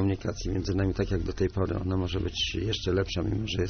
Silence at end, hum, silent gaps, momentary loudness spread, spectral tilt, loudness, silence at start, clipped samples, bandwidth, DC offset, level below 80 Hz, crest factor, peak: 0 s; none; none; 2 LU; -5.5 dB/octave; -29 LUFS; 0 s; under 0.1%; 6.6 kHz; under 0.1%; -40 dBFS; 14 dB; -14 dBFS